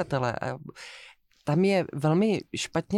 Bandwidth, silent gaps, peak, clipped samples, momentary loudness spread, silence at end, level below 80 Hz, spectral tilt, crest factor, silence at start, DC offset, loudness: 12.5 kHz; none; -14 dBFS; under 0.1%; 19 LU; 0 s; -60 dBFS; -6 dB/octave; 14 dB; 0 s; under 0.1%; -27 LUFS